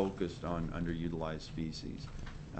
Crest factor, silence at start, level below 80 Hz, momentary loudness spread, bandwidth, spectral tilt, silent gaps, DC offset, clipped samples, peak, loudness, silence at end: 20 dB; 0 s; -48 dBFS; 8 LU; 8.4 kHz; -7 dB/octave; none; under 0.1%; under 0.1%; -18 dBFS; -40 LUFS; 0 s